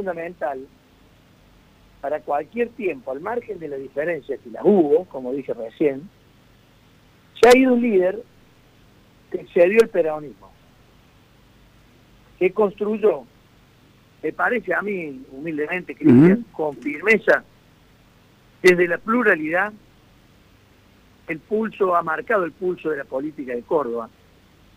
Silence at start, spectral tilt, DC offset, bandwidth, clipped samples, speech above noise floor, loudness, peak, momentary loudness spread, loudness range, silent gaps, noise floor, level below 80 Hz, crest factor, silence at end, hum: 0 s; -6.5 dB/octave; under 0.1%; 15.5 kHz; under 0.1%; 33 dB; -20 LUFS; -4 dBFS; 16 LU; 7 LU; none; -53 dBFS; -58 dBFS; 18 dB; 0.7 s; none